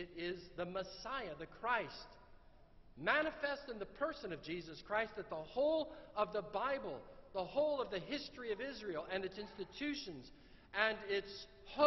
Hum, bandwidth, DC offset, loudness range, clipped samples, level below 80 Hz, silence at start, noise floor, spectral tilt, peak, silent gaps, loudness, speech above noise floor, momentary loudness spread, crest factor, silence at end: none; 6.2 kHz; under 0.1%; 2 LU; under 0.1%; -64 dBFS; 0 s; -62 dBFS; -2 dB/octave; -18 dBFS; none; -41 LUFS; 21 dB; 12 LU; 24 dB; 0 s